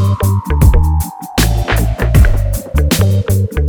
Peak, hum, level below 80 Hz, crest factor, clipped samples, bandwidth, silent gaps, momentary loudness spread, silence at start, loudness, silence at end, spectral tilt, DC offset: 0 dBFS; none; -14 dBFS; 12 dB; under 0.1%; over 20 kHz; none; 6 LU; 0 s; -13 LUFS; 0 s; -5.5 dB/octave; under 0.1%